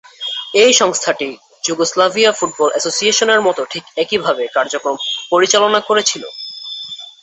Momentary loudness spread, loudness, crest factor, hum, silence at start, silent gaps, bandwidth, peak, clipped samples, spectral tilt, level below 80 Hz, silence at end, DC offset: 14 LU; -14 LUFS; 16 dB; none; 0.2 s; none; 8.4 kHz; 0 dBFS; under 0.1%; -1 dB/octave; -64 dBFS; 0.1 s; under 0.1%